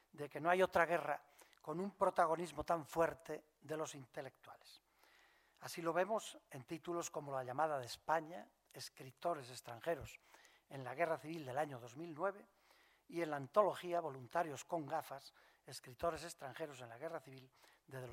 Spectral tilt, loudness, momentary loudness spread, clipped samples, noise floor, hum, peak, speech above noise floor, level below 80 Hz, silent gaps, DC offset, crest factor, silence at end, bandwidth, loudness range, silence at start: -4.5 dB/octave; -42 LUFS; 19 LU; under 0.1%; -72 dBFS; none; -18 dBFS; 30 dB; -74 dBFS; none; under 0.1%; 24 dB; 0 s; 16 kHz; 6 LU; 0.15 s